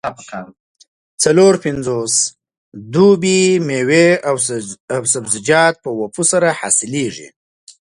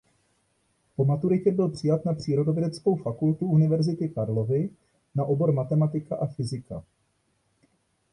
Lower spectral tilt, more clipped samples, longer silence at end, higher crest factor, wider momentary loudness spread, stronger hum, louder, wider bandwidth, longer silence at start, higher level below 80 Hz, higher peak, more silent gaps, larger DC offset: second, -3.5 dB/octave vs -9 dB/octave; neither; second, 0.65 s vs 1.3 s; about the same, 16 dB vs 16 dB; first, 13 LU vs 10 LU; neither; first, -14 LUFS vs -26 LUFS; about the same, 11.5 kHz vs 10.5 kHz; second, 0.05 s vs 1 s; about the same, -56 dBFS vs -60 dBFS; first, 0 dBFS vs -10 dBFS; first, 0.60-0.75 s, 0.88-1.18 s, 2.58-2.72 s, 4.80-4.88 s vs none; neither